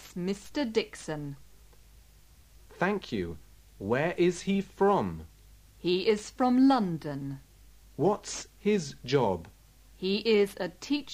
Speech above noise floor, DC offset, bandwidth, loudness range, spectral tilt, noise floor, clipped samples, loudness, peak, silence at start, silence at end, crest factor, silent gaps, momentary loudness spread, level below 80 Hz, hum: 28 dB; under 0.1%; 15.5 kHz; 7 LU; -5.5 dB/octave; -57 dBFS; under 0.1%; -29 LUFS; -12 dBFS; 0 s; 0 s; 18 dB; none; 13 LU; -56 dBFS; none